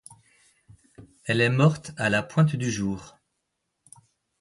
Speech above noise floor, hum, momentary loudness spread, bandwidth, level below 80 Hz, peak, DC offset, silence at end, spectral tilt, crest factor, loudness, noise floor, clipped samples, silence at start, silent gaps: 56 dB; none; 11 LU; 11.5 kHz; -58 dBFS; -8 dBFS; under 0.1%; 1.3 s; -6 dB/octave; 20 dB; -24 LUFS; -79 dBFS; under 0.1%; 1 s; none